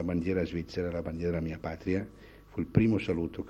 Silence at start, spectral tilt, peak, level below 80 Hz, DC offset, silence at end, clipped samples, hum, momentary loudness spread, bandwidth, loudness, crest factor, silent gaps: 0 s; -8.5 dB/octave; -10 dBFS; -52 dBFS; under 0.1%; 0 s; under 0.1%; none; 10 LU; 9 kHz; -32 LUFS; 22 dB; none